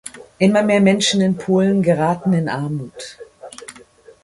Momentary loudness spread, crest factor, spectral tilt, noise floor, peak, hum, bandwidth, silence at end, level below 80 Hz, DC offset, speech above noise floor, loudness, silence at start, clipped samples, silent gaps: 22 LU; 16 dB; -5.5 dB/octave; -46 dBFS; -2 dBFS; none; 11.5 kHz; 0.45 s; -56 dBFS; under 0.1%; 29 dB; -17 LUFS; 0.05 s; under 0.1%; none